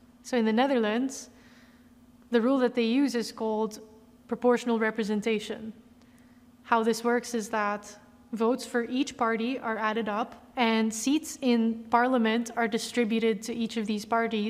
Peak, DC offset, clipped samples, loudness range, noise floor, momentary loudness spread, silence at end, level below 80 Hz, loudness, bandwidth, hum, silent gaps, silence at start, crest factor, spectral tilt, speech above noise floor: -10 dBFS; under 0.1%; under 0.1%; 3 LU; -56 dBFS; 9 LU; 0 s; -68 dBFS; -28 LUFS; 15.5 kHz; none; none; 0.25 s; 18 dB; -4.5 dB/octave; 29 dB